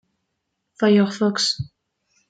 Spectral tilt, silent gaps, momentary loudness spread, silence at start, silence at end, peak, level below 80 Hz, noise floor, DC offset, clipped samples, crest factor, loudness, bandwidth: -4.5 dB/octave; none; 11 LU; 0.8 s; 0.6 s; -6 dBFS; -60 dBFS; -77 dBFS; under 0.1%; under 0.1%; 16 dB; -20 LUFS; 9.2 kHz